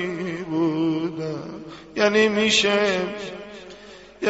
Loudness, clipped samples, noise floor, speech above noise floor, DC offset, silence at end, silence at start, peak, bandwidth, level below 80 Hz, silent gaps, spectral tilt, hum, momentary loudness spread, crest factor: -21 LUFS; under 0.1%; -44 dBFS; 24 dB; under 0.1%; 0 s; 0 s; -6 dBFS; 8 kHz; -58 dBFS; none; -2.5 dB/octave; none; 21 LU; 18 dB